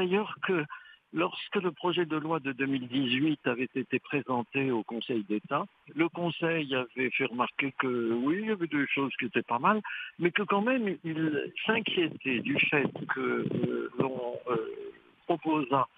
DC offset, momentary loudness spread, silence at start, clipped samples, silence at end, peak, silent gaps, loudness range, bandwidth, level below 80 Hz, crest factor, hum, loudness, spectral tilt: under 0.1%; 6 LU; 0 s; under 0.1%; 0.1 s; -10 dBFS; none; 2 LU; 4.9 kHz; -76 dBFS; 20 dB; none; -30 LUFS; -8.5 dB/octave